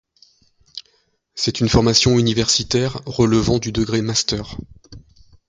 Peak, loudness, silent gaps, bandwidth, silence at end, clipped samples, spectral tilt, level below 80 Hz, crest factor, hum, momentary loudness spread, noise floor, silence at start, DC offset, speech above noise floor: 0 dBFS; -17 LUFS; none; 9.6 kHz; 0.5 s; under 0.1%; -4.5 dB/octave; -38 dBFS; 20 dB; none; 22 LU; -63 dBFS; 0.75 s; under 0.1%; 46 dB